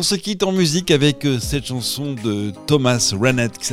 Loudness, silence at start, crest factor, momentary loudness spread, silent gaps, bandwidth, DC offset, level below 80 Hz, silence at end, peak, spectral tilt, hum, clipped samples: -18 LUFS; 0 s; 16 dB; 7 LU; none; 16.5 kHz; under 0.1%; -42 dBFS; 0 s; -2 dBFS; -4.5 dB/octave; none; under 0.1%